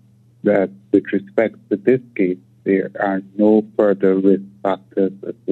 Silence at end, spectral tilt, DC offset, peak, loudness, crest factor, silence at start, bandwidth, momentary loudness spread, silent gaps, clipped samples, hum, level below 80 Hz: 0 s; -10 dB/octave; under 0.1%; 0 dBFS; -18 LUFS; 18 dB; 0.45 s; 4.2 kHz; 7 LU; none; under 0.1%; none; -68 dBFS